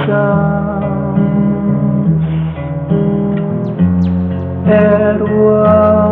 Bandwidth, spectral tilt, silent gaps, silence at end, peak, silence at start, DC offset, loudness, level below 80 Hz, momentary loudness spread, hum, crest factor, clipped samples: 4 kHz; -12 dB/octave; none; 0 s; 0 dBFS; 0 s; under 0.1%; -13 LUFS; -34 dBFS; 8 LU; none; 12 dB; under 0.1%